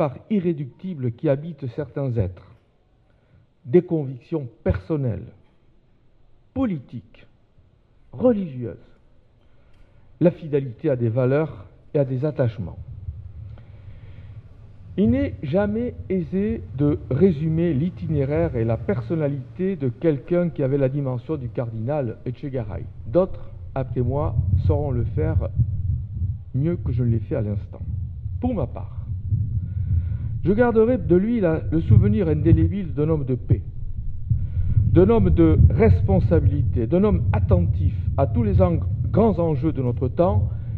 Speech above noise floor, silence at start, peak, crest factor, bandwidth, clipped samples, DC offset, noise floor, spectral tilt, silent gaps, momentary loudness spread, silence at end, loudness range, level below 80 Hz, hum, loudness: 39 dB; 0 s; -2 dBFS; 20 dB; 4.4 kHz; under 0.1%; under 0.1%; -59 dBFS; -12 dB/octave; none; 14 LU; 0 s; 9 LU; -32 dBFS; none; -22 LUFS